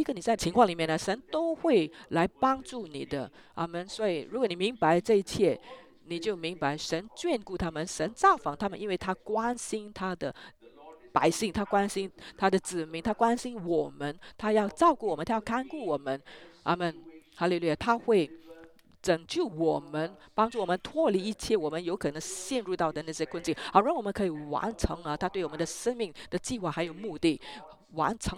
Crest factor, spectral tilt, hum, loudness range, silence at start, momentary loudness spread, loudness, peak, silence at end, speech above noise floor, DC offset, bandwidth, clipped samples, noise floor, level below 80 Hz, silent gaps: 22 dB; -5 dB/octave; none; 2 LU; 0 s; 11 LU; -30 LUFS; -8 dBFS; 0 s; 25 dB; under 0.1%; 16 kHz; under 0.1%; -55 dBFS; -54 dBFS; none